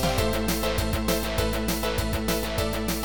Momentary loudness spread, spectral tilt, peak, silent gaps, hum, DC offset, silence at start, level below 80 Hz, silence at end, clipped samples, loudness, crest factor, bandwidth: 2 LU; -4.5 dB/octave; -10 dBFS; none; none; 0.9%; 0 s; -32 dBFS; 0 s; under 0.1%; -26 LUFS; 16 dB; over 20 kHz